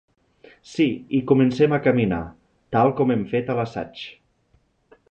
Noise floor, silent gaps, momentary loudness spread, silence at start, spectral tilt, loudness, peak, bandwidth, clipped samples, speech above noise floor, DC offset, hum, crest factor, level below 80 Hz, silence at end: -63 dBFS; none; 16 LU; 0.7 s; -8 dB/octave; -21 LUFS; -4 dBFS; 8.4 kHz; under 0.1%; 43 dB; under 0.1%; none; 18 dB; -52 dBFS; 1 s